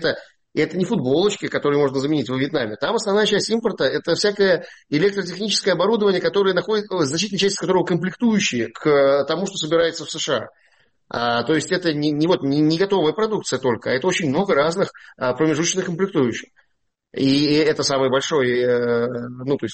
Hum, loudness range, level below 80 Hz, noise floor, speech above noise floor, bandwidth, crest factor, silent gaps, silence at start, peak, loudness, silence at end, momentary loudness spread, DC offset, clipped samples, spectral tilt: none; 2 LU; -60 dBFS; -71 dBFS; 52 dB; 8.8 kHz; 14 dB; none; 0 s; -6 dBFS; -20 LUFS; 0 s; 7 LU; under 0.1%; under 0.1%; -4.5 dB/octave